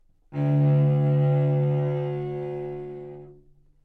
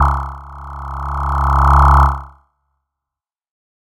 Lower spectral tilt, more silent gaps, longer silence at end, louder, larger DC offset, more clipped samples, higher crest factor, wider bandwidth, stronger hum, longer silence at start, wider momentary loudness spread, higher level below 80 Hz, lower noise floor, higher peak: first, -11.5 dB/octave vs -7.5 dB/octave; neither; second, 0.5 s vs 1.55 s; second, -24 LUFS vs -14 LUFS; neither; neither; about the same, 12 dB vs 16 dB; second, 3.4 kHz vs 7.8 kHz; neither; first, 0.3 s vs 0 s; second, 17 LU vs 20 LU; second, -58 dBFS vs -18 dBFS; second, -55 dBFS vs -87 dBFS; second, -12 dBFS vs 0 dBFS